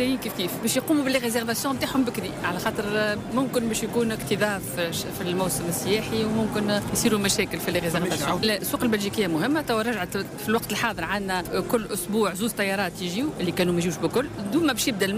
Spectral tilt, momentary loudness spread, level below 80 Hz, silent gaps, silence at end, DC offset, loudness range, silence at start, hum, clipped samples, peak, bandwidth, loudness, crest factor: -4 dB/octave; 4 LU; -50 dBFS; none; 0 s; under 0.1%; 2 LU; 0 s; none; under 0.1%; -12 dBFS; 16 kHz; -25 LUFS; 14 dB